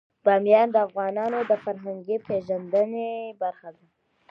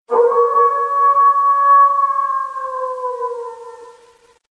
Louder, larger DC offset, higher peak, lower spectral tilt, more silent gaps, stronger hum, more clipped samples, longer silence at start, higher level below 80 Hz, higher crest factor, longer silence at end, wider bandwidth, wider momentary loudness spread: second, -25 LUFS vs -14 LUFS; neither; about the same, -6 dBFS vs -4 dBFS; first, -8 dB/octave vs -3.5 dB/octave; neither; neither; neither; first, 0.25 s vs 0.1 s; about the same, -74 dBFS vs -72 dBFS; first, 18 dB vs 12 dB; about the same, 0.6 s vs 0.6 s; second, 5.6 kHz vs 9 kHz; about the same, 13 LU vs 14 LU